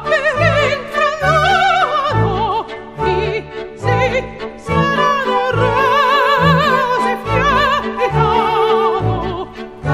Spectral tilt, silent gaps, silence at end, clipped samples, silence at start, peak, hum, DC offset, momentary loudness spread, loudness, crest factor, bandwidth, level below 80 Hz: -5.5 dB/octave; none; 0 s; under 0.1%; 0 s; 0 dBFS; none; under 0.1%; 10 LU; -14 LUFS; 14 dB; 14.5 kHz; -34 dBFS